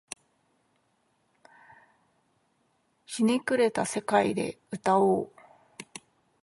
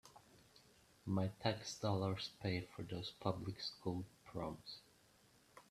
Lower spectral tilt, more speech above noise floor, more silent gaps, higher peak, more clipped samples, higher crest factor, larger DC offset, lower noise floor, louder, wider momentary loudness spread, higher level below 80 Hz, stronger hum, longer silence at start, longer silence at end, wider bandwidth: about the same, -5 dB/octave vs -5.5 dB/octave; first, 46 dB vs 28 dB; neither; first, -10 dBFS vs -22 dBFS; neither; about the same, 22 dB vs 22 dB; neither; about the same, -72 dBFS vs -71 dBFS; first, -27 LUFS vs -44 LUFS; first, 20 LU vs 16 LU; about the same, -70 dBFS vs -72 dBFS; neither; first, 3.1 s vs 0.05 s; first, 0.45 s vs 0.1 s; second, 11.5 kHz vs 14 kHz